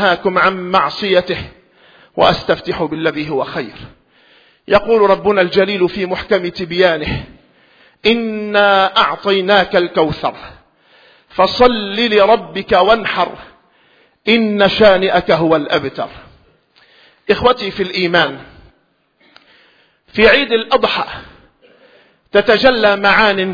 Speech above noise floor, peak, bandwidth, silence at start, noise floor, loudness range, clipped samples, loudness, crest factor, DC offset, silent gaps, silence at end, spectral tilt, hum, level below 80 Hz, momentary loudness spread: 46 dB; 0 dBFS; 5.4 kHz; 0 s; -59 dBFS; 4 LU; under 0.1%; -13 LUFS; 14 dB; under 0.1%; none; 0 s; -6 dB/octave; none; -42 dBFS; 12 LU